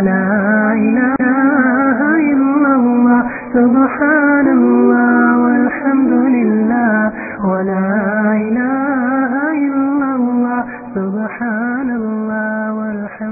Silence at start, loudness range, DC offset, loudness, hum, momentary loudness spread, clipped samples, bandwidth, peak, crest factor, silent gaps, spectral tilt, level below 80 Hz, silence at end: 0 s; 6 LU; under 0.1%; -14 LUFS; none; 8 LU; under 0.1%; 2.7 kHz; 0 dBFS; 12 dB; none; -16.5 dB/octave; -52 dBFS; 0 s